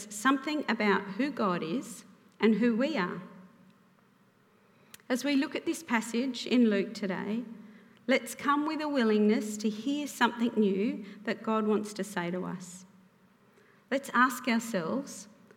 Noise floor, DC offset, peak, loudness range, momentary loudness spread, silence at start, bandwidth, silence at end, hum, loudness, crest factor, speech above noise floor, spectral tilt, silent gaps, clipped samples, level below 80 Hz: -64 dBFS; under 0.1%; -12 dBFS; 5 LU; 12 LU; 0 s; 16.5 kHz; 0.3 s; none; -30 LUFS; 20 dB; 35 dB; -5 dB/octave; none; under 0.1%; -84 dBFS